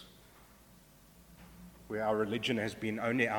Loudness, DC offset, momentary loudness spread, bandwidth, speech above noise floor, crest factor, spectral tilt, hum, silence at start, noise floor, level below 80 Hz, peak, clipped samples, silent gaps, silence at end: -34 LUFS; under 0.1%; 23 LU; 19 kHz; 27 dB; 22 dB; -5.5 dB/octave; none; 0 s; -60 dBFS; -64 dBFS; -16 dBFS; under 0.1%; none; 0 s